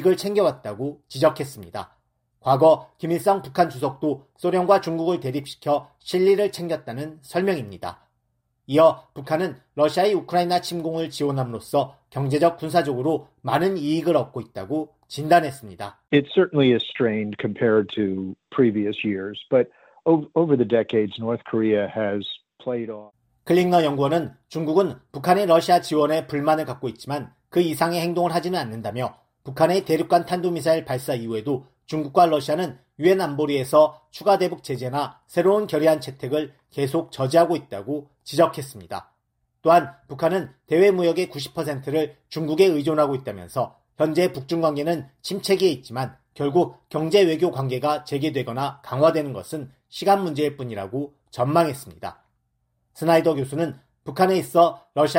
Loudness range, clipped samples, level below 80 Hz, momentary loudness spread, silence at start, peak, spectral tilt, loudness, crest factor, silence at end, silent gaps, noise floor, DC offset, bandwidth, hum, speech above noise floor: 3 LU; under 0.1%; -64 dBFS; 13 LU; 0 s; -4 dBFS; -6 dB/octave; -22 LUFS; 18 dB; 0 s; none; -73 dBFS; under 0.1%; 16 kHz; none; 51 dB